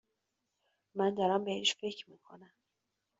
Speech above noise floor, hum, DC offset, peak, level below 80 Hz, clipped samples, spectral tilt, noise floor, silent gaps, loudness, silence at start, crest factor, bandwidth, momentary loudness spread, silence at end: 51 dB; none; under 0.1%; -16 dBFS; -80 dBFS; under 0.1%; -2.5 dB/octave; -85 dBFS; none; -33 LUFS; 0.95 s; 22 dB; 7.6 kHz; 16 LU; 0.75 s